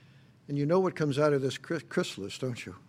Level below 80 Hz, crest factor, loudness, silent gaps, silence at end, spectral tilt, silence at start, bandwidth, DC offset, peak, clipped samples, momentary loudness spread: -72 dBFS; 18 dB; -30 LUFS; none; 0.1 s; -6 dB/octave; 0.5 s; 15.5 kHz; under 0.1%; -12 dBFS; under 0.1%; 9 LU